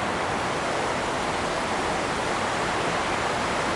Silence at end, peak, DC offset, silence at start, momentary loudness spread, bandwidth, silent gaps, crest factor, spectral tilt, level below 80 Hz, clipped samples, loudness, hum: 0 s; -14 dBFS; under 0.1%; 0 s; 1 LU; 11.5 kHz; none; 12 dB; -3.5 dB/octave; -48 dBFS; under 0.1%; -26 LUFS; none